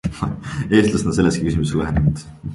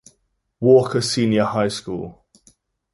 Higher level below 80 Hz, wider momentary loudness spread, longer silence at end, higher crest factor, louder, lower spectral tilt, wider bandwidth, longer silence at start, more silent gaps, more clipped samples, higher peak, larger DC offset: first, -32 dBFS vs -56 dBFS; second, 10 LU vs 15 LU; second, 0 s vs 0.8 s; about the same, 16 dB vs 18 dB; about the same, -19 LUFS vs -19 LUFS; about the same, -6.5 dB/octave vs -5.5 dB/octave; about the same, 11.5 kHz vs 11.5 kHz; second, 0.05 s vs 0.6 s; neither; neither; about the same, -2 dBFS vs -2 dBFS; neither